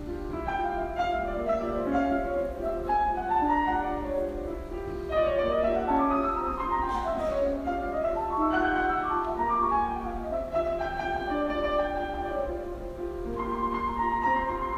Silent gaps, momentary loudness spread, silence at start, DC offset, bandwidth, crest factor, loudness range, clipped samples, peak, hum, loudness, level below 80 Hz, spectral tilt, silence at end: none; 8 LU; 0 s; under 0.1%; 15.5 kHz; 14 dB; 3 LU; under 0.1%; -14 dBFS; none; -29 LUFS; -42 dBFS; -7 dB/octave; 0 s